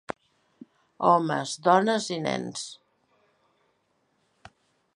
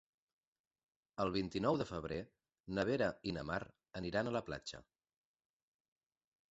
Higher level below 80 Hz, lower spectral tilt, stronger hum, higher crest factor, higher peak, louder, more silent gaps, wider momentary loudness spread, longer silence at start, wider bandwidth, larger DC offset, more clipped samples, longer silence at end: second, -74 dBFS vs -64 dBFS; about the same, -4.5 dB/octave vs -4.5 dB/octave; neither; about the same, 22 dB vs 22 dB; first, -6 dBFS vs -20 dBFS; first, -25 LUFS vs -40 LUFS; second, none vs 2.60-2.64 s; first, 18 LU vs 14 LU; second, 1 s vs 1.2 s; first, 11 kHz vs 8 kHz; neither; neither; first, 2.2 s vs 1.7 s